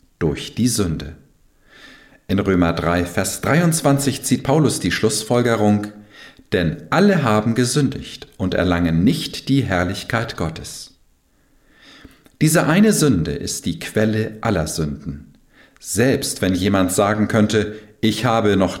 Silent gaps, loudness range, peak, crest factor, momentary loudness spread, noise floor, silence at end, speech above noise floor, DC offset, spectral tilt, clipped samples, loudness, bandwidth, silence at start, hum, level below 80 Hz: none; 4 LU; -4 dBFS; 14 dB; 11 LU; -58 dBFS; 0 s; 40 dB; under 0.1%; -5 dB/octave; under 0.1%; -18 LUFS; 17 kHz; 0.2 s; none; -42 dBFS